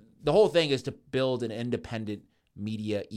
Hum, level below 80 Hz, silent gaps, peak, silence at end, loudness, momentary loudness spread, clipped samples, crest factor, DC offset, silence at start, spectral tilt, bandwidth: none; -58 dBFS; none; -10 dBFS; 0 s; -28 LUFS; 15 LU; under 0.1%; 18 dB; under 0.1%; 0.25 s; -6 dB/octave; 12.5 kHz